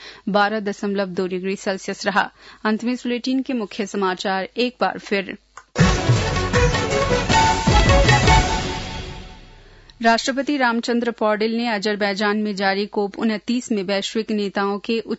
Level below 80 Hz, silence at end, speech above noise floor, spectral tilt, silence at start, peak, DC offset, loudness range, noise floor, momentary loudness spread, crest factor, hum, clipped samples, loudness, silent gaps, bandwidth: -30 dBFS; 0 s; 24 dB; -5 dB/octave; 0 s; -4 dBFS; under 0.1%; 6 LU; -46 dBFS; 9 LU; 18 dB; none; under 0.1%; -20 LUFS; none; 8 kHz